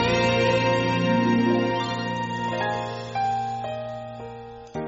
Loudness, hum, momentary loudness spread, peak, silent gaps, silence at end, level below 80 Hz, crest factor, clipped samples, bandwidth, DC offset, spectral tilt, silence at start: -24 LUFS; none; 15 LU; -10 dBFS; none; 0 s; -52 dBFS; 14 dB; under 0.1%; 7.8 kHz; under 0.1%; -4.5 dB/octave; 0 s